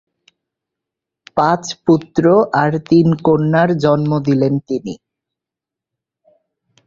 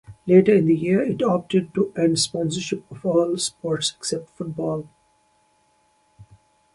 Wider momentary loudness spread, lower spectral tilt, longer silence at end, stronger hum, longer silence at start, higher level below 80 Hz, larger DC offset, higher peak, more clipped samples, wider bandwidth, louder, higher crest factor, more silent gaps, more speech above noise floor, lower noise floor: about the same, 10 LU vs 11 LU; first, -7.5 dB/octave vs -5 dB/octave; first, 1.9 s vs 0.5 s; neither; first, 1.35 s vs 0.1 s; first, -52 dBFS vs -60 dBFS; neither; about the same, 0 dBFS vs -2 dBFS; neither; second, 7.6 kHz vs 11.5 kHz; first, -15 LUFS vs -21 LUFS; about the same, 16 dB vs 20 dB; neither; first, 72 dB vs 42 dB; first, -85 dBFS vs -63 dBFS